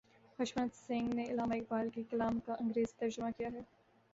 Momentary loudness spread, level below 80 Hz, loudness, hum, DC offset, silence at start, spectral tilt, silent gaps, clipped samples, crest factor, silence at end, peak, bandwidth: 7 LU; -68 dBFS; -38 LUFS; none; under 0.1%; 0.4 s; -5 dB/octave; none; under 0.1%; 14 dB; 0.5 s; -24 dBFS; 7.8 kHz